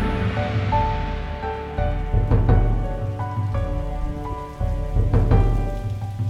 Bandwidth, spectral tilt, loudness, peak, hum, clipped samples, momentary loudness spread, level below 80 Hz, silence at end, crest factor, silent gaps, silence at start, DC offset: 6.8 kHz; -8.5 dB/octave; -23 LUFS; -4 dBFS; none; under 0.1%; 10 LU; -24 dBFS; 0 s; 16 dB; none; 0 s; under 0.1%